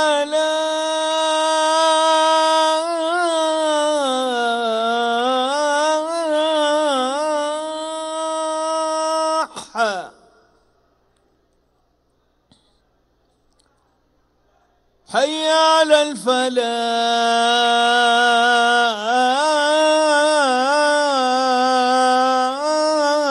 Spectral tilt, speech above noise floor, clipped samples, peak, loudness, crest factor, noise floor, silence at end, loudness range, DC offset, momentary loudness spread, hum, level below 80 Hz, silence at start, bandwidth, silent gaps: -1 dB/octave; 47 dB; under 0.1%; -2 dBFS; -17 LUFS; 18 dB; -63 dBFS; 0 s; 9 LU; under 0.1%; 7 LU; none; -66 dBFS; 0 s; 12 kHz; none